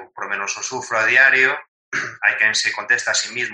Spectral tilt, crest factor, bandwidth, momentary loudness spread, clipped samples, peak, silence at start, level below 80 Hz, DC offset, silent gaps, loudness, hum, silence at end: 0 dB/octave; 18 dB; 10.5 kHz; 13 LU; under 0.1%; -2 dBFS; 0 s; -72 dBFS; under 0.1%; 1.68-1.92 s; -17 LUFS; none; 0 s